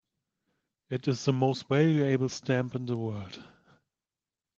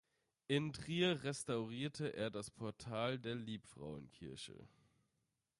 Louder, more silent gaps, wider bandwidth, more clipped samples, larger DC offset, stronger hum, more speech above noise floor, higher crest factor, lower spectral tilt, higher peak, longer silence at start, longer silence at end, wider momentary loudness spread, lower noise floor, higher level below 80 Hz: first, -29 LUFS vs -43 LUFS; neither; second, 7.6 kHz vs 11.5 kHz; neither; neither; neither; first, over 62 dB vs 44 dB; about the same, 20 dB vs 20 dB; first, -6.5 dB/octave vs -5 dB/octave; first, -10 dBFS vs -24 dBFS; first, 0.9 s vs 0.5 s; first, 1.15 s vs 0.9 s; about the same, 14 LU vs 15 LU; about the same, under -90 dBFS vs -87 dBFS; about the same, -70 dBFS vs -72 dBFS